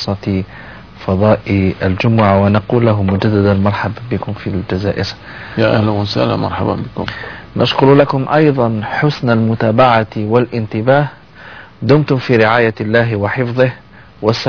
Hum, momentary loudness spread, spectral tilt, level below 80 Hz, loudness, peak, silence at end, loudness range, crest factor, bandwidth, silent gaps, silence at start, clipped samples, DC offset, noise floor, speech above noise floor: none; 12 LU; -8 dB/octave; -42 dBFS; -14 LUFS; 0 dBFS; 0 s; 4 LU; 14 dB; 5.4 kHz; none; 0 s; under 0.1%; 0.4%; -35 dBFS; 22 dB